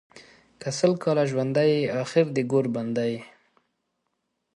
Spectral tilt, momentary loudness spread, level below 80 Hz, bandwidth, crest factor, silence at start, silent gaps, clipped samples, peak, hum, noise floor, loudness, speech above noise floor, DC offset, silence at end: -6 dB/octave; 8 LU; -70 dBFS; 11.5 kHz; 18 dB; 0.15 s; none; under 0.1%; -8 dBFS; none; -78 dBFS; -24 LUFS; 54 dB; under 0.1%; 1.3 s